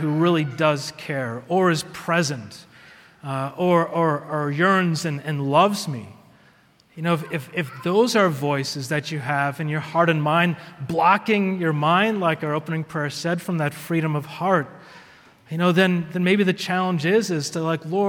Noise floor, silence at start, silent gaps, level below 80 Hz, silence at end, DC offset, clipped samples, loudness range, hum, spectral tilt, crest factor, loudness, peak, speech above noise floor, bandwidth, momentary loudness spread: -56 dBFS; 0 s; none; -66 dBFS; 0 s; under 0.1%; under 0.1%; 3 LU; none; -5.5 dB/octave; 20 dB; -22 LUFS; -2 dBFS; 35 dB; 17 kHz; 9 LU